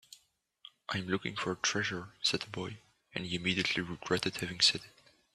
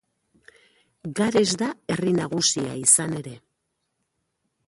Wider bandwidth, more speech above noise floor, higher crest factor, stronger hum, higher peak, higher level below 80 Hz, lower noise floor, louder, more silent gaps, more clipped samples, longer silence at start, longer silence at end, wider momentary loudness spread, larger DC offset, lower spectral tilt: first, 13.5 kHz vs 12 kHz; second, 36 dB vs 54 dB; about the same, 22 dB vs 22 dB; neither; second, -14 dBFS vs -4 dBFS; about the same, -68 dBFS vs -64 dBFS; second, -71 dBFS vs -77 dBFS; second, -33 LUFS vs -21 LUFS; neither; neither; second, 0.1 s vs 1.05 s; second, 0.45 s vs 1.3 s; about the same, 15 LU vs 16 LU; neither; about the same, -3 dB/octave vs -3 dB/octave